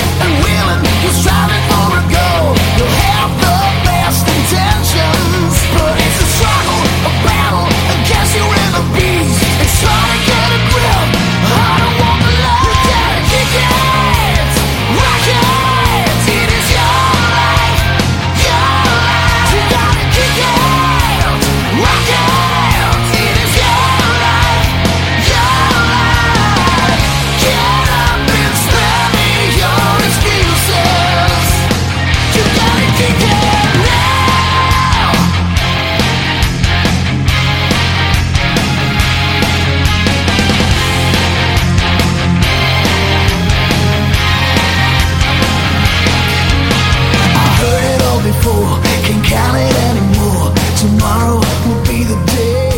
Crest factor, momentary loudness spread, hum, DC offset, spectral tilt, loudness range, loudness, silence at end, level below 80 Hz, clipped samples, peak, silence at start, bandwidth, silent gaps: 10 dB; 2 LU; none; under 0.1%; -4.5 dB/octave; 1 LU; -10 LUFS; 0 s; -20 dBFS; under 0.1%; 0 dBFS; 0 s; 17 kHz; none